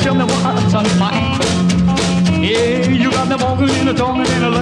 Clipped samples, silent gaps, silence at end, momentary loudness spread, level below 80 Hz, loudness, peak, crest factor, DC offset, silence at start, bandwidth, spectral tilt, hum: under 0.1%; none; 0 s; 2 LU; -34 dBFS; -14 LUFS; -2 dBFS; 12 dB; under 0.1%; 0 s; 11 kHz; -5.5 dB/octave; none